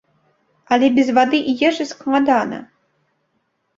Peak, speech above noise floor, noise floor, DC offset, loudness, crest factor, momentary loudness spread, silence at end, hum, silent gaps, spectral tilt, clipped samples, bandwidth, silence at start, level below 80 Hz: -2 dBFS; 52 dB; -69 dBFS; under 0.1%; -17 LUFS; 18 dB; 9 LU; 1.15 s; none; none; -4.5 dB/octave; under 0.1%; 7.8 kHz; 0.7 s; -60 dBFS